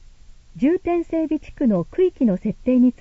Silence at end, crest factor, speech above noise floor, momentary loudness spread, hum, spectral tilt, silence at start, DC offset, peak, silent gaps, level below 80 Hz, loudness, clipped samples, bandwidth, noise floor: 0.1 s; 12 dB; 25 dB; 5 LU; none; -9.5 dB/octave; 0.55 s; under 0.1%; -8 dBFS; none; -44 dBFS; -21 LUFS; under 0.1%; 7.2 kHz; -44 dBFS